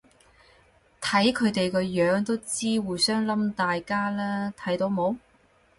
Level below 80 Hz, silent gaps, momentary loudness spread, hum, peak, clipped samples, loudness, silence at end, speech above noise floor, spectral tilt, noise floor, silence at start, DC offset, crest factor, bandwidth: -60 dBFS; none; 7 LU; none; -8 dBFS; under 0.1%; -26 LUFS; 0.6 s; 36 dB; -4.5 dB/octave; -61 dBFS; 1 s; under 0.1%; 18 dB; 11.5 kHz